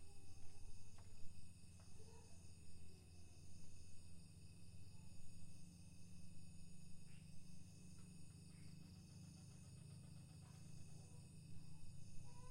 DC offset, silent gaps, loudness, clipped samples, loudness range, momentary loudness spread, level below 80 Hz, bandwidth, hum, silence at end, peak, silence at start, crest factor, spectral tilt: under 0.1%; none; -63 LUFS; under 0.1%; 3 LU; 3 LU; -66 dBFS; 15.5 kHz; none; 0 s; -36 dBFS; 0 s; 16 dB; -5 dB/octave